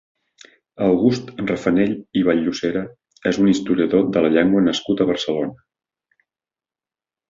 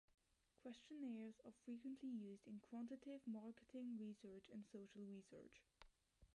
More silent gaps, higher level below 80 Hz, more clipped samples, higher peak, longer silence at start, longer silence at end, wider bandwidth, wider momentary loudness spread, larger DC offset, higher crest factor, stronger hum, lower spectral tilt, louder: neither; first, -54 dBFS vs -84 dBFS; neither; first, -4 dBFS vs -44 dBFS; first, 0.8 s vs 0.65 s; first, 1.75 s vs 0.1 s; second, 7.8 kHz vs 11 kHz; about the same, 8 LU vs 8 LU; neither; first, 18 dB vs 12 dB; neither; about the same, -6 dB/octave vs -6.5 dB/octave; first, -19 LUFS vs -57 LUFS